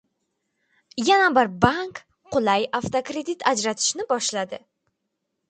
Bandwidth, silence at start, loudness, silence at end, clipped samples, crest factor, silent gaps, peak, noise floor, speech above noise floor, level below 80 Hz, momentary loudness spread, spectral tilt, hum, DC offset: 9.4 kHz; 0.95 s; -22 LUFS; 0.9 s; under 0.1%; 22 dB; none; -2 dBFS; -78 dBFS; 56 dB; -56 dBFS; 15 LU; -3 dB/octave; none; under 0.1%